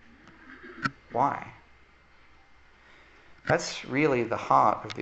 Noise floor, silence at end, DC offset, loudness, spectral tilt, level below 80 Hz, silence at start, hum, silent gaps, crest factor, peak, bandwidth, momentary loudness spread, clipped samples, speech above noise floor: -57 dBFS; 0 s; under 0.1%; -27 LUFS; -5 dB/octave; -60 dBFS; 0.25 s; none; none; 22 dB; -8 dBFS; 8.4 kHz; 24 LU; under 0.1%; 31 dB